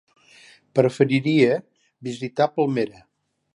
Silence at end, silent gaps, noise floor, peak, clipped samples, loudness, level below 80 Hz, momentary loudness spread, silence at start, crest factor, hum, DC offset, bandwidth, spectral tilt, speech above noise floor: 0.65 s; none; -52 dBFS; -2 dBFS; under 0.1%; -22 LUFS; -68 dBFS; 12 LU; 0.75 s; 20 dB; none; under 0.1%; 11.5 kHz; -7 dB/octave; 31 dB